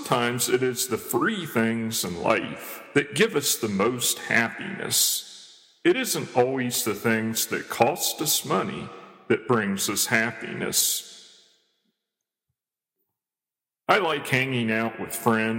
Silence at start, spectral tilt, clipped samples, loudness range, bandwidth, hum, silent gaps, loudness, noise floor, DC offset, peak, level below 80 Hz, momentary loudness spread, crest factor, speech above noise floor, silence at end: 0 s; -3 dB/octave; under 0.1%; 5 LU; 17 kHz; none; none; -24 LUFS; under -90 dBFS; under 0.1%; -4 dBFS; -68 dBFS; 7 LU; 22 dB; over 65 dB; 0 s